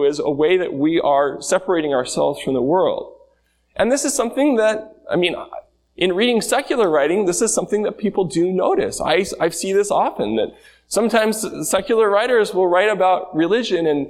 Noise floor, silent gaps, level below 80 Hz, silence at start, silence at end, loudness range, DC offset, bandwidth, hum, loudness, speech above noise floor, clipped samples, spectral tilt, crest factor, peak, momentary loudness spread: -61 dBFS; none; -54 dBFS; 0 s; 0 s; 2 LU; under 0.1%; 15.5 kHz; none; -18 LUFS; 43 dB; under 0.1%; -4 dB/octave; 16 dB; -2 dBFS; 6 LU